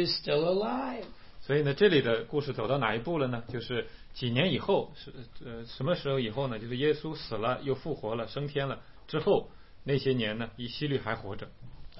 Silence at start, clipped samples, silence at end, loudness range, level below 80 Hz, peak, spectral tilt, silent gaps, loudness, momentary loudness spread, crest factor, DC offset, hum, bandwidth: 0 s; under 0.1%; 0 s; 4 LU; -54 dBFS; -12 dBFS; -10 dB/octave; none; -31 LUFS; 15 LU; 20 dB; 0.3%; none; 5.8 kHz